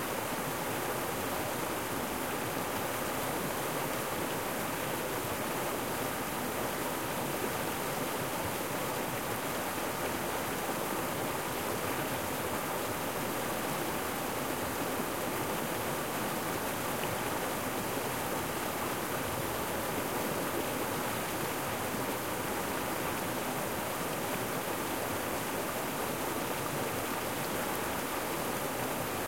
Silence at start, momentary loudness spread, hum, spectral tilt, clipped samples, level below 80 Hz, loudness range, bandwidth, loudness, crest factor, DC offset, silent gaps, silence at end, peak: 0 s; 1 LU; none; -3.5 dB/octave; under 0.1%; -58 dBFS; 0 LU; 16.5 kHz; -34 LUFS; 16 dB; 0.2%; none; 0 s; -18 dBFS